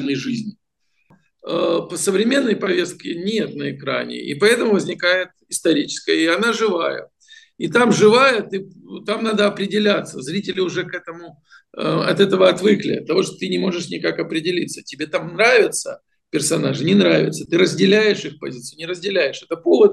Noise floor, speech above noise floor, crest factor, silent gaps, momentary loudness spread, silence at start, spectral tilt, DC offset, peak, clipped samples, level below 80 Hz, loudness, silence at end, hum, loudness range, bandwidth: -64 dBFS; 45 dB; 18 dB; none; 14 LU; 0 s; -4.5 dB/octave; under 0.1%; 0 dBFS; under 0.1%; -66 dBFS; -18 LUFS; 0 s; none; 4 LU; 12.5 kHz